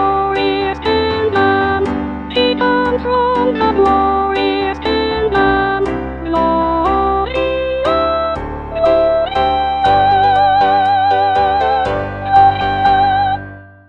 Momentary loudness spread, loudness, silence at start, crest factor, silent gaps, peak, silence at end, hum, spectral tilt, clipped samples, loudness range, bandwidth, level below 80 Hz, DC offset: 7 LU; -14 LUFS; 0 s; 14 dB; none; 0 dBFS; 0.2 s; none; -7 dB/octave; under 0.1%; 3 LU; 7.6 kHz; -32 dBFS; 0.3%